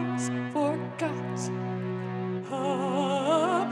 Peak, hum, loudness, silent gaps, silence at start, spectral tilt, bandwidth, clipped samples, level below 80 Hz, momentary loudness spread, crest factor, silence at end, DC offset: -12 dBFS; none; -29 LUFS; none; 0 s; -6 dB/octave; 11.5 kHz; under 0.1%; -82 dBFS; 8 LU; 16 dB; 0 s; under 0.1%